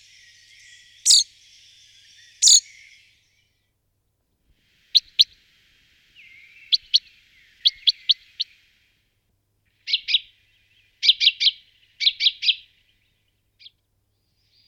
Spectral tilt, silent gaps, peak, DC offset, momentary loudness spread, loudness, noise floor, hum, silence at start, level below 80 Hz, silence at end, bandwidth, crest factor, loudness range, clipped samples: 6.5 dB/octave; none; -2 dBFS; under 0.1%; 11 LU; -18 LUFS; -72 dBFS; none; 1.05 s; -70 dBFS; 2.1 s; 19.5 kHz; 22 dB; 5 LU; under 0.1%